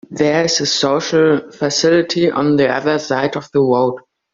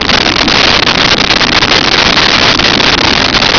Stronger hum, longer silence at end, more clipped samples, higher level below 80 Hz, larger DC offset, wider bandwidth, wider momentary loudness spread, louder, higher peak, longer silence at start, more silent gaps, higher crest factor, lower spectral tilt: neither; first, 0.35 s vs 0 s; neither; second, -56 dBFS vs -26 dBFS; neither; first, 7.6 kHz vs 5.4 kHz; first, 5 LU vs 1 LU; second, -15 LUFS vs -5 LUFS; about the same, -2 dBFS vs 0 dBFS; about the same, 0.1 s vs 0 s; neither; first, 14 dB vs 8 dB; first, -4 dB/octave vs -2.5 dB/octave